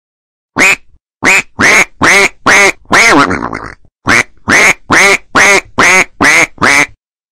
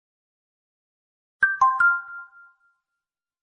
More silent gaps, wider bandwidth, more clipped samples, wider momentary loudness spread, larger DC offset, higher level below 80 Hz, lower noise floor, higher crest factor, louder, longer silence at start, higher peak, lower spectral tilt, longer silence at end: neither; first, 16.5 kHz vs 9.6 kHz; neither; second, 8 LU vs 21 LU; neither; first, -38 dBFS vs -72 dBFS; second, -32 dBFS vs -87 dBFS; second, 10 dB vs 20 dB; first, -6 LUFS vs -20 LUFS; second, 0.55 s vs 1.4 s; first, 0 dBFS vs -8 dBFS; about the same, -2 dB/octave vs -1 dB/octave; second, 0.5 s vs 1.2 s